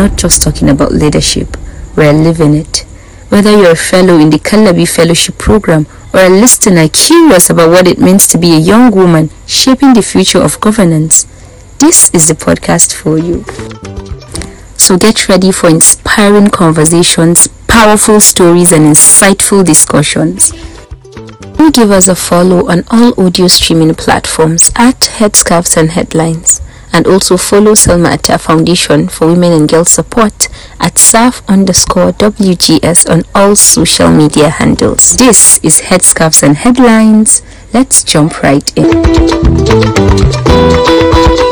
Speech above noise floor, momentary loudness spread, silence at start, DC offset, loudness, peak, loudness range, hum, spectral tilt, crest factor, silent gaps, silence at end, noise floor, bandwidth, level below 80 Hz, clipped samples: 22 dB; 8 LU; 0 s; under 0.1%; -5 LUFS; 0 dBFS; 4 LU; none; -4 dB/octave; 6 dB; none; 0 s; -27 dBFS; over 20 kHz; -22 dBFS; 20%